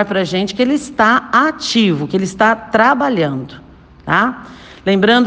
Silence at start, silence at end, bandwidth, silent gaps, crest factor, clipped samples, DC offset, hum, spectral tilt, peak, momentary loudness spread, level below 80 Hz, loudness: 0 s; 0 s; 9.6 kHz; none; 14 dB; under 0.1%; under 0.1%; none; -5 dB/octave; 0 dBFS; 9 LU; -48 dBFS; -14 LUFS